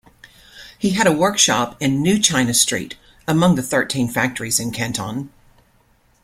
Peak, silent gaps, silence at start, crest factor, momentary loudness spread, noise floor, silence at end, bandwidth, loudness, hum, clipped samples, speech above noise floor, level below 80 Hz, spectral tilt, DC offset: 0 dBFS; none; 0.55 s; 20 dB; 12 LU; -57 dBFS; 0.95 s; 16.5 kHz; -18 LUFS; none; under 0.1%; 39 dB; -50 dBFS; -3.5 dB/octave; under 0.1%